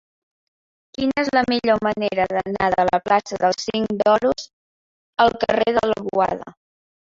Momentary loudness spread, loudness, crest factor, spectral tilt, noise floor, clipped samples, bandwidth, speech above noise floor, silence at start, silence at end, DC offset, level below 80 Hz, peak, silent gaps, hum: 7 LU; -20 LUFS; 20 dB; -5 dB/octave; under -90 dBFS; under 0.1%; 7.8 kHz; over 71 dB; 1 s; 0.6 s; under 0.1%; -52 dBFS; -2 dBFS; 4.53-5.13 s; none